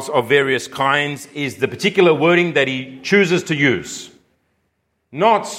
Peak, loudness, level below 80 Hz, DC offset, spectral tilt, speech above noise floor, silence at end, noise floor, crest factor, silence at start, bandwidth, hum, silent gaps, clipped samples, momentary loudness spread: 0 dBFS; -17 LUFS; -62 dBFS; under 0.1%; -4.5 dB/octave; 52 dB; 0 s; -69 dBFS; 18 dB; 0 s; 16 kHz; none; none; under 0.1%; 11 LU